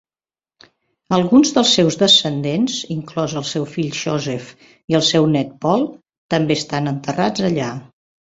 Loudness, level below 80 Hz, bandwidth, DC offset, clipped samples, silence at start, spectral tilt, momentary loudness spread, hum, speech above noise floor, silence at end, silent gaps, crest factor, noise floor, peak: -17 LUFS; -56 dBFS; 8 kHz; under 0.1%; under 0.1%; 1.1 s; -4.5 dB/octave; 11 LU; none; over 73 dB; 0.45 s; 4.84-4.88 s, 6.18-6.29 s; 16 dB; under -90 dBFS; -2 dBFS